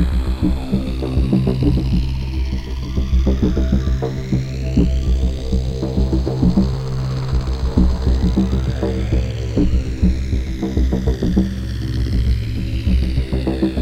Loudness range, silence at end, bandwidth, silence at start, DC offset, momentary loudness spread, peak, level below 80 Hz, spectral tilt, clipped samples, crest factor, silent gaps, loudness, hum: 1 LU; 0 s; 8.4 kHz; 0 s; under 0.1%; 5 LU; 0 dBFS; -20 dBFS; -8 dB/octave; under 0.1%; 16 dB; none; -19 LUFS; none